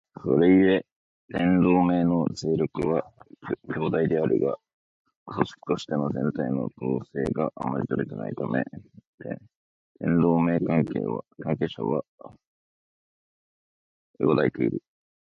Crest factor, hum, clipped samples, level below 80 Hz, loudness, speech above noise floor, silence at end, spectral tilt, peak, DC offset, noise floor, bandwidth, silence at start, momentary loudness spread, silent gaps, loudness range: 20 dB; none; under 0.1%; -56 dBFS; -25 LUFS; over 65 dB; 0.5 s; -8 dB/octave; -6 dBFS; under 0.1%; under -90 dBFS; 7.8 kHz; 0.2 s; 14 LU; 0.92-1.28 s, 4.74-5.05 s, 5.16-5.26 s, 9.07-9.18 s, 9.56-9.95 s, 12.08-12.18 s, 12.47-14.14 s; 6 LU